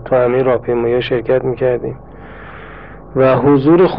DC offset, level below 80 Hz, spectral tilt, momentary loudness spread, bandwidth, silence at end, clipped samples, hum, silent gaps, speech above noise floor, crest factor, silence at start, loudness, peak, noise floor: 0.8%; -40 dBFS; -10.5 dB/octave; 23 LU; 5.2 kHz; 0 s; under 0.1%; none; none; 21 dB; 14 dB; 0 s; -14 LUFS; 0 dBFS; -34 dBFS